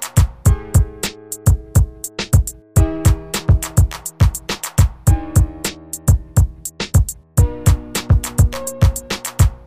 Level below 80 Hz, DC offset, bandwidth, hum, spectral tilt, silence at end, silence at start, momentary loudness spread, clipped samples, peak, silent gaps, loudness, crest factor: -20 dBFS; 0.4%; 15.5 kHz; none; -5 dB/octave; 0.1 s; 0 s; 7 LU; under 0.1%; 0 dBFS; none; -18 LUFS; 16 dB